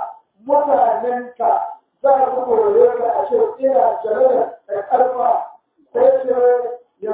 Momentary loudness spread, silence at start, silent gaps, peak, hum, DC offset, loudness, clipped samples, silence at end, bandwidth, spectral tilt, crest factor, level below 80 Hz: 12 LU; 0 s; none; -2 dBFS; none; under 0.1%; -17 LUFS; under 0.1%; 0 s; 4 kHz; -9 dB/octave; 14 dB; -64 dBFS